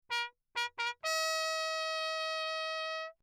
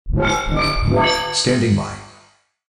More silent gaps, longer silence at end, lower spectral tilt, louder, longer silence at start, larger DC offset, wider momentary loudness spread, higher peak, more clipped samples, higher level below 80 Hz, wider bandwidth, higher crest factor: neither; second, 0.1 s vs 0.6 s; second, 4 dB/octave vs -4.5 dB/octave; second, -35 LUFS vs -18 LUFS; about the same, 0.1 s vs 0.05 s; neither; about the same, 6 LU vs 6 LU; second, -22 dBFS vs -4 dBFS; neither; second, -84 dBFS vs -28 dBFS; first, 19.5 kHz vs 13.5 kHz; about the same, 16 dB vs 14 dB